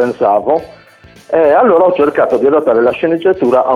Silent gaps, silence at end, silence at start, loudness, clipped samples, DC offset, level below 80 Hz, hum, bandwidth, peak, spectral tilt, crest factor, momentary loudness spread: none; 0 s; 0 s; -11 LUFS; under 0.1%; under 0.1%; -50 dBFS; none; 10.5 kHz; 0 dBFS; -7.5 dB/octave; 10 dB; 5 LU